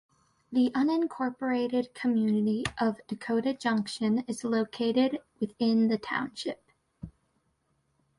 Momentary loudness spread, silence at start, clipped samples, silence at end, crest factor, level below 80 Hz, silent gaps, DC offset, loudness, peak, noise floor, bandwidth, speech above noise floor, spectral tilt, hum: 11 LU; 0.5 s; under 0.1%; 1.1 s; 16 dB; -64 dBFS; none; under 0.1%; -29 LUFS; -12 dBFS; -74 dBFS; 11.5 kHz; 46 dB; -5.5 dB/octave; none